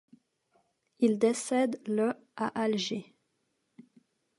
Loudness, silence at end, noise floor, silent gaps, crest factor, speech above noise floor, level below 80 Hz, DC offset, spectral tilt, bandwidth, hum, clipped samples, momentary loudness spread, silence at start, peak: -30 LUFS; 1.35 s; -78 dBFS; none; 20 dB; 49 dB; -82 dBFS; under 0.1%; -4.5 dB/octave; 11.5 kHz; none; under 0.1%; 9 LU; 1 s; -14 dBFS